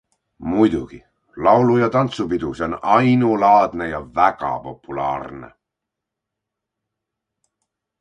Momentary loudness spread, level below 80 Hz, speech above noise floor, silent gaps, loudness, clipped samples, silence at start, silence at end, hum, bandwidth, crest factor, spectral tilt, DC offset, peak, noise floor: 15 LU; -48 dBFS; 65 dB; none; -18 LUFS; under 0.1%; 0.4 s; 2.55 s; none; 9 kHz; 20 dB; -7.5 dB/octave; under 0.1%; 0 dBFS; -83 dBFS